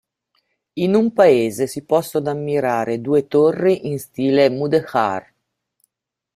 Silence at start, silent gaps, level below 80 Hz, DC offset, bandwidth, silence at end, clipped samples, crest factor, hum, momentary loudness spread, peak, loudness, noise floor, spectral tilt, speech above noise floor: 0.75 s; none; -62 dBFS; under 0.1%; 15.5 kHz; 1.15 s; under 0.1%; 16 dB; none; 9 LU; -2 dBFS; -18 LUFS; -73 dBFS; -6.5 dB/octave; 55 dB